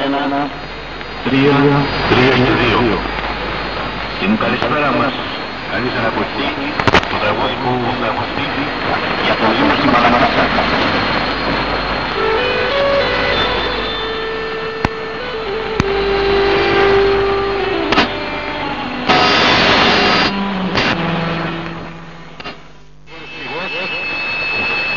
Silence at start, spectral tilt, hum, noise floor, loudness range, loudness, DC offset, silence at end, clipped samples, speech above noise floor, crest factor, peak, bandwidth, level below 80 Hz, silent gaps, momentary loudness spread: 0 s; -5.5 dB/octave; none; -41 dBFS; 5 LU; -15 LUFS; 1%; 0 s; under 0.1%; 27 dB; 16 dB; 0 dBFS; 7.2 kHz; -34 dBFS; none; 11 LU